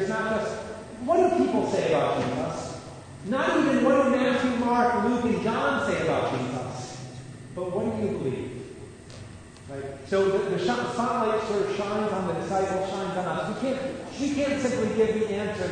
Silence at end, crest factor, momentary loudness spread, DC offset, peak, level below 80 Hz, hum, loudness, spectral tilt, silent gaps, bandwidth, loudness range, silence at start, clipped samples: 0 s; 16 dB; 17 LU; under 0.1%; -10 dBFS; -56 dBFS; none; -26 LUFS; -5.5 dB/octave; none; 9.6 kHz; 7 LU; 0 s; under 0.1%